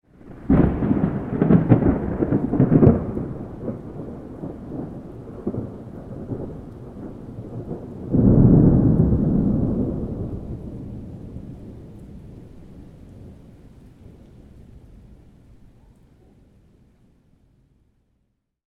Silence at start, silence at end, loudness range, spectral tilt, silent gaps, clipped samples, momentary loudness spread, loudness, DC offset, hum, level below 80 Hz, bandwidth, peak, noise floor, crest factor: 0.25 s; 3.55 s; 19 LU; -12 dB/octave; none; under 0.1%; 24 LU; -20 LUFS; under 0.1%; none; -34 dBFS; 3.6 kHz; 0 dBFS; -71 dBFS; 22 dB